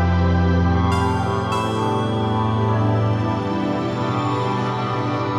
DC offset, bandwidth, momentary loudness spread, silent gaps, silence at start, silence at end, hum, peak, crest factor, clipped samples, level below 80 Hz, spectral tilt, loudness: under 0.1%; 11 kHz; 4 LU; none; 0 s; 0 s; none; -8 dBFS; 12 dB; under 0.1%; -36 dBFS; -7.5 dB/octave; -20 LUFS